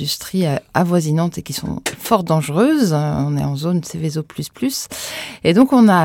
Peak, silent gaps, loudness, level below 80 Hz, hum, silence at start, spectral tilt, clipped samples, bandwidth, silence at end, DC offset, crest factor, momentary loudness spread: 0 dBFS; none; -18 LUFS; -48 dBFS; none; 0 s; -6 dB/octave; under 0.1%; 18 kHz; 0 s; under 0.1%; 16 dB; 11 LU